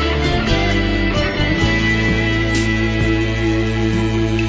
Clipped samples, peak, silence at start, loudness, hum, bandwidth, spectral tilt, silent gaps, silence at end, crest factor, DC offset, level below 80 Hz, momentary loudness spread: under 0.1%; -4 dBFS; 0 s; -17 LUFS; none; 8 kHz; -6 dB/octave; none; 0 s; 12 dB; under 0.1%; -24 dBFS; 2 LU